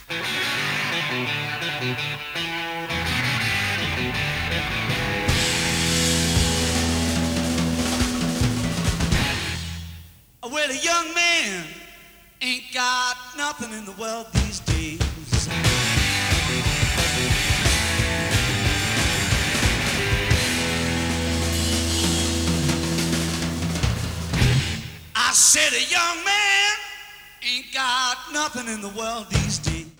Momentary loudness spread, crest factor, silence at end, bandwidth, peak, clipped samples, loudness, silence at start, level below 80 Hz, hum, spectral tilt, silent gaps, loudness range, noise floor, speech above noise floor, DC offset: 9 LU; 20 dB; 0.1 s; over 20 kHz; -2 dBFS; under 0.1%; -21 LUFS; 0 s; -34 dBFS; none; -3 dB/octave; none; 6 LU; -48 dBFS; 25 dB; under 0.1%